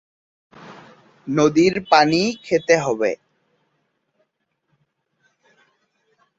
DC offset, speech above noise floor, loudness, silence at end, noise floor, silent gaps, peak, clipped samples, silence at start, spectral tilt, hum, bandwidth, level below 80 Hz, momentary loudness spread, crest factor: under 0.1%; 55 dB; -18 LUFS; 3.25 s; -73 dBFS; none; -2 dBFS; under 0.1%; 0.65 s; -5 dB/octave; none; 8 kHz; -62 dBFS; 10 LU; 20 dB